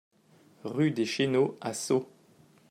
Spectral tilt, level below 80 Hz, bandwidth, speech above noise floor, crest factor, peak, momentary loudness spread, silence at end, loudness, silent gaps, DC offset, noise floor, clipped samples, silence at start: -5 dB/octave; -76 dBFS; 14.5 kHz; 33 dB; 16 dB; -14 dBFS; 12 LU; 0.65 s; -29 LUFS; none; under 0.1%; -61 dBFS; under 0.1%; 0.65 s